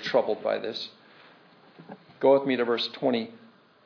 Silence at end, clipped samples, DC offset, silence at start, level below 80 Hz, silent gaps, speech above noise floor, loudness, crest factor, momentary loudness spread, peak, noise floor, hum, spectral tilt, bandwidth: 0.5 s; under 0.1%; under 0.1%; 0 s; -88 dBFS; none; 30 dB; -26 LUFS; 20 dB; 22 LU; -8 dBFS; -56 dBFS; none; -5.5 dB/octave; 5.4 kHz